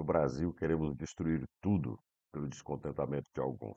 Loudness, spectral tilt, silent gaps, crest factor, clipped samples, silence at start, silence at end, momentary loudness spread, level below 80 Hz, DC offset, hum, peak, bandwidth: -37 LUFS; -8 dB/octave; none; 20 dB; under 0.1%; 0 s; 0 s; 9 LU; -56 dBFS; under 0.1%; none; -16 dBFS; 8 kHz